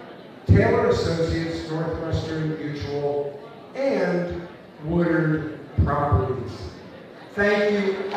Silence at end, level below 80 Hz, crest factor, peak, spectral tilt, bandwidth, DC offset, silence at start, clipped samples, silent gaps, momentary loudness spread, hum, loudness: 0 s; -38 dBFS; 18 dB; -6 dBFS; -7.5 dB/octave; 9.4 kHz; under 0.1%; 0 s; under 0.1%; none; 17 LU; none; -23 LUFS